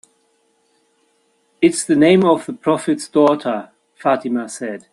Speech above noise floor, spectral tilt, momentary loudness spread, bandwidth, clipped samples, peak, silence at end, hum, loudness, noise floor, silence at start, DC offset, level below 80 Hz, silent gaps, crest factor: 46 dB; -5 dB/octave; 12 LU; 12 kHz; under 0.1%; 0 dBFS; 0.15 s; none; -17 LUFS; -62 dBFS; 1.6 s; under 0.1%; -62 dBFS; none; 18 dB